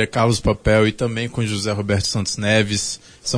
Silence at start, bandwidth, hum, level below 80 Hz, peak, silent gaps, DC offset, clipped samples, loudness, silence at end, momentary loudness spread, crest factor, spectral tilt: 0 s; 11 kHz; none; -36 dBFS; -2 dBFS; none; under 0.1%; under 0.1%; -19 LUFS; 0 s; 6 LU; 16 dB; -4.5 dB/octave